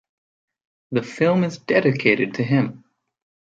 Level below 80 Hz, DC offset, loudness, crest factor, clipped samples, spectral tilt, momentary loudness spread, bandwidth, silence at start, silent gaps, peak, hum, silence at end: -66 dBFS; under 0.1%; -20 LUFS; 20 dB; under 0.1%; -7 dB/octave; 8 LU; 7.8 kHz; 0.9 s; none; -2 dBFS; none; 0.8 s